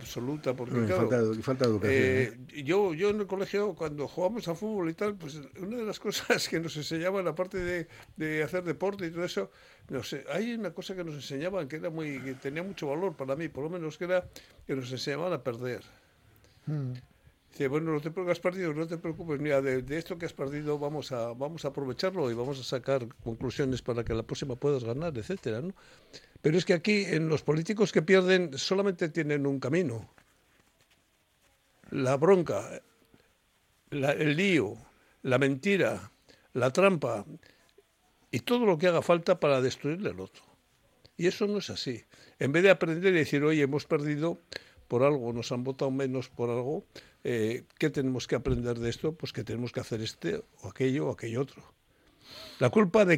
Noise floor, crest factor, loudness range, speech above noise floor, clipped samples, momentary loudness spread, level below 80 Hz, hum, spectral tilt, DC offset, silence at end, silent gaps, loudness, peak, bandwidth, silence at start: -69 dBFS; 22 dB; 7 LU; 40 dB; under 0.1%; 13 LU; -58 dBFS; none; -6 dB/octave; under 0.1%; 0 s; none; -30 LUFS; -8 dBFS; 16 kHz; 0 s